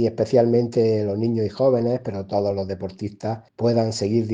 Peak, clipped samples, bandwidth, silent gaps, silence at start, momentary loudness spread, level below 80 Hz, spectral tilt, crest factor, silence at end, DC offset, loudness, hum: -6 dBFS; under 0.1%; 9.6 kHz; none; 0 s; 11 LU; -58 dBFS; -7.5 dB/octave; 16 dB; 0 s; under 0.1%; -22 LUFS; none